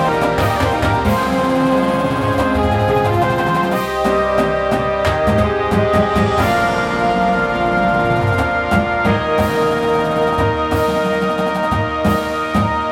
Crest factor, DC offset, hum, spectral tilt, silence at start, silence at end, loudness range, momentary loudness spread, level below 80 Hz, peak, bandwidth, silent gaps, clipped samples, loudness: 12 dB; under 0.1%; none; -6.5 dB/octave; 0 s; 0 s; 1 LU; 2 LU; -32 dBFS; -4 dBFS; 17 kHz; none; under 0.1%; -16 LUFS